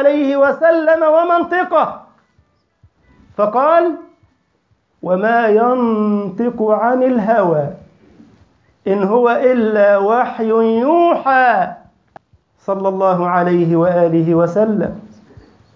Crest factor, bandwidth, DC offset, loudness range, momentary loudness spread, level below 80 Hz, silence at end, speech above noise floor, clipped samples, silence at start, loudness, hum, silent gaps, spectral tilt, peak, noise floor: 14 dB; 6.8 kHz; under 0.1%; 4 LU; 8 LU; -56 dBFS; 0.7 s; 48 dB; under 0.1%; 0 s; -14 LUFS; none; none; -9 dB/octave; -2 dBFS; -61 dBFS